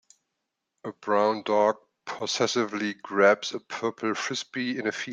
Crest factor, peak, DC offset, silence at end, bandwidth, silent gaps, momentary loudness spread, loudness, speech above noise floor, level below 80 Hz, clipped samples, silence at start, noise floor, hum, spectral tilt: 20 dB; -8 dBFS; under 0.1%; 0 s; 9.4 kHz; none; 15 LU; -26 LUFS; 56 dB; -78 dBFS; under 0.1%; 0.85 s; -82 dBFS; none; -3.5 dB/octave